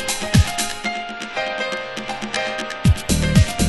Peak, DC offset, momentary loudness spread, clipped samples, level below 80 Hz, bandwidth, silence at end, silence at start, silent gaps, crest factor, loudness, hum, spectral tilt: -2 dBFS; under 0.1%; 10 LU; under 0.1%; -28 dBFS; 12.5 kHz; 0 s; 0 s; none; 18 dB; -21 LUFS; none; -4.5 dB/octave